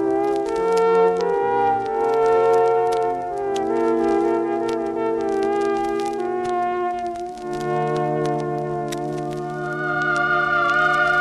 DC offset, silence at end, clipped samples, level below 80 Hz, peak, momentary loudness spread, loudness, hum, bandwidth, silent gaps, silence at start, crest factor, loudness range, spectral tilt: under 0.1%; 0 s; under 0.1%; -54 dBFS; -6 dBFS; 9 LU; -21 LUFS; none; 12.5 kHz; none; 0 s; 14 dB; 5 LU; -6 dB/octave